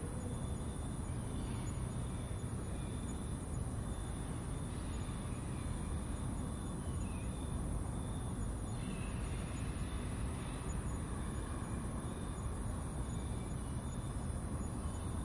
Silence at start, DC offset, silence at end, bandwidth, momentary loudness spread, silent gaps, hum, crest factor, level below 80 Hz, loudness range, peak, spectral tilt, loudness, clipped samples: 0 s; under 0.1%; 0 s; 11.5 kHz; 1 LU; none; none; 12 dB; -46 dBFS; 1 LU; -28 dBFS; -6 dB/octave; -42 LUFS; under 0.1%